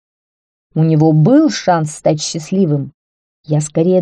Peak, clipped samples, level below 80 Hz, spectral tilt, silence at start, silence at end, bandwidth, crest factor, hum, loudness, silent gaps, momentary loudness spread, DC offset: -2 dBFS; under 0.1%; -56 dBFS; -6.5 dB/octave; 0.75 s; 0 s; 11 kHz; 12 dB; none; -14 LUFS; 2.94-3.44 s; 9 LU; under 0.1%